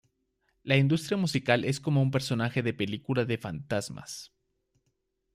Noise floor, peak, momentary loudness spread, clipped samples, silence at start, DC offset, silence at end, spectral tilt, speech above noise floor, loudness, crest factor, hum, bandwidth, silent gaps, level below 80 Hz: -78 dBFS; -10 dBFS; 14 LU; under 0.1%; 0.65 s; under 0.1%; 1.1 s; -6 dB/octave; 49 dB; -28 LUFS; 20 dB; none; 14 kHz; none; -64 dBFS